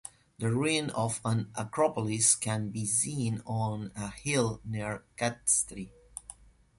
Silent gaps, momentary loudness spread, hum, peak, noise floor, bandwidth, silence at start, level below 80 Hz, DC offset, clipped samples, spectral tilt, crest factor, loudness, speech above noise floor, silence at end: none; 17 LU; none; -10 dBFS; -53 dBFS; 11.5 kHz; 0.05 s; -58 dBFS; under 0.1%; under 0.1%; -4 dB/octave; 22 dB; -30 LUFS; 22 dB; 0.45 s